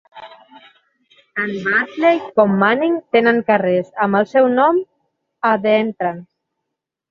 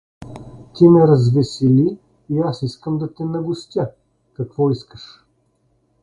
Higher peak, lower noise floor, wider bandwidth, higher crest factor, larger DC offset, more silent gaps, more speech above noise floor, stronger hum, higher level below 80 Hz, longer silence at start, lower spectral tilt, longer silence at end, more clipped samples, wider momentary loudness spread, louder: about the same, -2 dBFS vs 0 dBFS; first, -80 dBFS vs -63 dBFS; second, 7 kHz vs 10.5 kHz; about the same, 16 dB vs 18 dB; neither; neither; first, 64 dB vs 47 dB; neither; second, -64 dBFS vs -52 dBFS; about the same, 0.15 s vs 0.2 s; second, -7.5 dB/octave vs -9 dB/octave; second, 0.85 s vs 1 s; neither; second, 10 LU vs 25 LU; about the same, -16 LUFS vs -17 LUFS